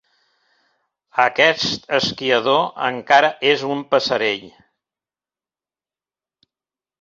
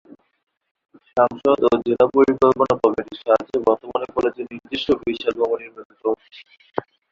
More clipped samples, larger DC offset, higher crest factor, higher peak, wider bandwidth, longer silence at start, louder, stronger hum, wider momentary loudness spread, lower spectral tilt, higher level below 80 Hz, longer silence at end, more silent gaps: neither; neither; about the same, 20 dB vs 20 dB; about the same, 0 dBFS vs -2 dBFS; about the same, 7.8 kHz vs 7.4 kHz; about the same, 1.15 s vs 1.15 s; about the same, -18 LUFS vs -20 LUFS; neither; second, 8 LU vs 14 LU; second, -3.5 dB/octave vs -6.5 dB/octave; second, -62 dBFS vs -54 dBFS; first, 2.5 s vs 0.3 s; second, none vs 5.85-5.90 s